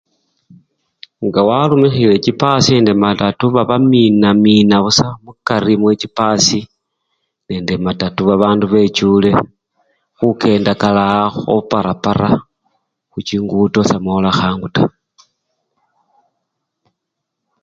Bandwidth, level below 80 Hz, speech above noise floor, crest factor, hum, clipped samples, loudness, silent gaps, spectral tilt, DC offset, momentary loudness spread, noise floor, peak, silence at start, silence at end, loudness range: 7.8 kHz; -44 dBFS; 64 dB; 14 dB; none; under 0.1%; -13 LUFS; none; -5.5 dB/octave; under 0.1%; 8 LU; -77 dBFS; 0 dBFS; 1.2 s; 2.75 s; 6 LU